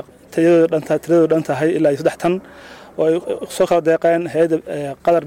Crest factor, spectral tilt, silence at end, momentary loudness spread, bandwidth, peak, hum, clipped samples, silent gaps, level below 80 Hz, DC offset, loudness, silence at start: 10 dB; -6.5 dB/octave; 0 s; 9 LU; 16 kHz; -6 dBFS; none; under 0.1%; none; -56 dBFS; under 0.1%; -17 LUFS; 0.3 s